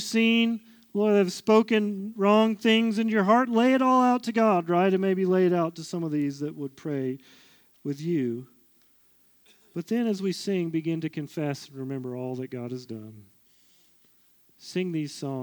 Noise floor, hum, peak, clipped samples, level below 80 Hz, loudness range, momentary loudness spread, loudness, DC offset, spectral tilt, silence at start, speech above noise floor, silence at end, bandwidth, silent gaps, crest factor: -62 dBFS; none; -8 dBFS; under 0.1%; -80 dBFS; 14 LU; 14 LU; -25 LUFS; under 0.1%; -6 dB/octave; 0 s; 37 dB; 0 s; over 20 kHz; none; 18 dB